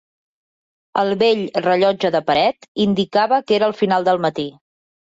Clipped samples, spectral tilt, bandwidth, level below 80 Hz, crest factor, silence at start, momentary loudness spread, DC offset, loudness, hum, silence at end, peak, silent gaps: under 0.1%; -6 dB/octave; 7.8 kHz; -60 dBFS; 14 dB; 0.95 s; 5 LU; under 0.1%; -18 LUFS; none; 0.65 s; -4 dBFS; 2.68-2.75 s